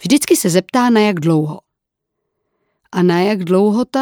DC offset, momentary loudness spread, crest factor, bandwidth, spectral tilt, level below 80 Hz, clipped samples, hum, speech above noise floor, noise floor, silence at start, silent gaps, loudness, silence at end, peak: under 0.1%; 8 LU; 16 dB; over 20 kHz; -5.5 dB/octave; -62 dBFS; under 0.1%; none; 64 dB; -78 dBFS; 0 s; none; -14 LUFS; 0 s; 0 dBFS